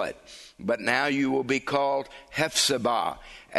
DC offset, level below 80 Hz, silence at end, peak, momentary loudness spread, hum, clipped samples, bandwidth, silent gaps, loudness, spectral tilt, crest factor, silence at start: under 0.1%; -60 dBFS; 0 s; -8 dBFS; 13 LU; none; under 0.1%; 12.5 kHz; none; -26 LUFS; -3 dB/octave; 20 dB; 0 s